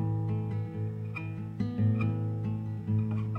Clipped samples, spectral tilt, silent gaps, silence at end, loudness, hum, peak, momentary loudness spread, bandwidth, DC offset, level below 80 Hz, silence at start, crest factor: under 0.1%; -10.5 dB/octave; none; 0 s; -32 LUFS; none; -18 dBFS; 8 LU; 4.3 kHz; under 0.1%; -56 dBFS; 0 s; 12 dB